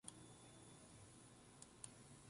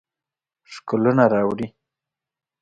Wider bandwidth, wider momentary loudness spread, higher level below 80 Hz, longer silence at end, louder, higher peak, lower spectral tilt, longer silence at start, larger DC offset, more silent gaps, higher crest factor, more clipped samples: first, 11.5 kHz vs 8.8 kHz; second, 5 LU vs 20 LU; second, -78 dBFS vs -60 dBFS; second, 0 s vs 0.95 s; second, -61 LUFS vs -20 LUFS; second, -36 dBFS vs -4 dBFS; second, -3.5 dB/octave vs -8 dB/octave; second, 0.05 s vs 0.7 s; neither; neither; first, 26 dB vs 20 dB; neither